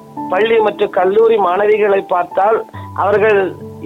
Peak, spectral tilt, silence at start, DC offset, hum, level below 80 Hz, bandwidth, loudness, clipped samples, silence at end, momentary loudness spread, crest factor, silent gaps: -4 dBFS; -6.5 dB/octave; 0.1 s; under 0.1%; none; -58 dBFS; 5.4 kHz; -13 LUFS; under 0.1%; 0 s; 7 LU; 10 dB; none